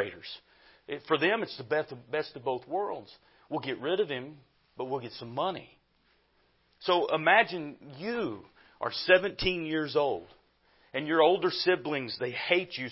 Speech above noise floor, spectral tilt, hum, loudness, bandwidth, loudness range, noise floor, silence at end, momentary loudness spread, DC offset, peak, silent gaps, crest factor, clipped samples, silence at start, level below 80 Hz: 39 dB; -8 dB/octave; none; -29 LUFS; 5.8 kHz; 8 LU; -69 dBFS; 0 s; 16 LU; under 0.1%; -8 dBFS; none; 22 dB; under 0.1%; 0 s; -62 dBFS